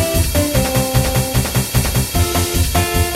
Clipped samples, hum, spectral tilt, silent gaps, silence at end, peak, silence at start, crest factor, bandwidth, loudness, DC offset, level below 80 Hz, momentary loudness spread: under 0.1%; none; -4.5 dB/octave; none; 0 s; -2 dBFS; 0 s; 14 dB; 16.5 kHz; -16 LUFS; under 0.1%; -24 dBFS; 1 LU